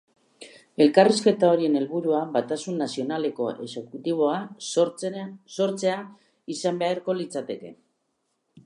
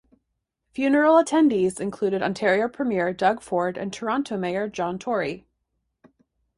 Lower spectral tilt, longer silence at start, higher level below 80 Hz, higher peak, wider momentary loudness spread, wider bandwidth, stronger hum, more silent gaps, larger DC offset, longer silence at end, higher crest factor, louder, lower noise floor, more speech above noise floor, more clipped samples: about the same, -5 dB/octave vs -5.5 dB/octave; second, 0.4 s vs 0.75 s; second, -80 dBFS vs -62 dBFS; about the same, -4 dBFS vs -6 dBFS; first, 16 LU vs 10 LU; about the same, 11.5 kHz vs 11.5 kHz; neither; neither; neither; second, 0.05 s vs 1.2 s; about the same, 22 dB vs 18 dB; about the same, -24 LUFS vs -23 LUFS; about the same, -75 dBFS vs -78 dBFS; second, 51 dB vs 56 dB; neither